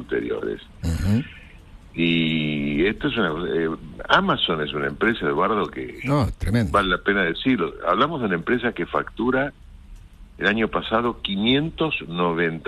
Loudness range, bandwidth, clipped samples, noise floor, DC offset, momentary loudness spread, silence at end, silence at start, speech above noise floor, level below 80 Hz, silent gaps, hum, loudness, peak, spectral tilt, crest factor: 2 LU; 13 kHz; under 0.1%; -44 dBFS; under 0.1%; 7 LU; 0 s; 0 s; 22 dB; -40 dBFS; none; none; -22 LUFS; -4 dBFS; -6.5 dB/octave; 20 dB